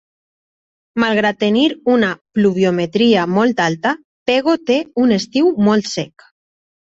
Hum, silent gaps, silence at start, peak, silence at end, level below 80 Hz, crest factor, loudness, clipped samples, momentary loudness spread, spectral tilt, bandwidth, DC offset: none; 2.21-2.25 s, 4.05-4.26 s; 0.95 s; -2 dBFS; 0.8 s; -56 dBFS; 14 dB; -16 LUFS; under 0.1%; 7 LU; -5.5 dB/octave; 8 kHz; under 0.1%